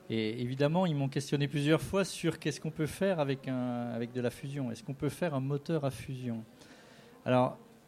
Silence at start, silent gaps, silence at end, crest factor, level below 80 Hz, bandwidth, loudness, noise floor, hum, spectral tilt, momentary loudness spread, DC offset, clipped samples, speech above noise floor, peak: 0 s; none; 0.15 s; 20 dB; -62 dBFS; 15 kHz; -33 LUFS; -56 dBFS; none; -6.5 dB/octave; 9 LU; under 0.1%; under 0.1%; 23 dB; -14 dBFS